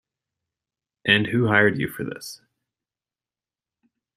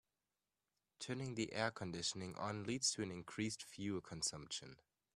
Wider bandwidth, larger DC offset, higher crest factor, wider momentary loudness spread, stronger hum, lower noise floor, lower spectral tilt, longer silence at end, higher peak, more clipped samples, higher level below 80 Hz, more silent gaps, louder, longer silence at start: first, 15 kHz vs 13.5 kHz; neither; about the same, 24 dB vs 22 dB; first, 16 LU vs 9 LU; neither; about the same, under -90 dBFS vs under -90 dBFS; first, -5.5 dB/octave vs -3 dB/octave; first, 1.8 s vs 0.4 s; first, -2 dBFS vs -22 dBFS; neither; first, -62 dBFS vs -76 dBFS; neither; first, -20 LUFS vs -43 LUFS; about the same, 1.05 s vs 1 s